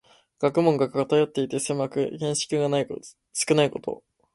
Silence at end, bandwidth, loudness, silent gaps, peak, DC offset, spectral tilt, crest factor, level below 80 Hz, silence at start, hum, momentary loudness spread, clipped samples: 0.4 s; 11.5 kHz; -25 LUFS; none; -6 dBFS; under 0.1%; -4.5 dB/octave; 20 dB; -66 dBFS; 0.4 s; none; 12 LU; under 0.1%